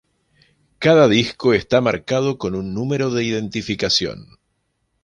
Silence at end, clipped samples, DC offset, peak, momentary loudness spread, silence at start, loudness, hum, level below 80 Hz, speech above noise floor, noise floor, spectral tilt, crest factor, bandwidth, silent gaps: 0.8 s; under 0.1%; under 0.1%; -2 dBFS; 11 LU; 0.8 s; -18 LUFS; none; -50 dBFS; 52 dB; -70 dBFS; -5 dB/octave; 18 dB; 10.5 kHz; none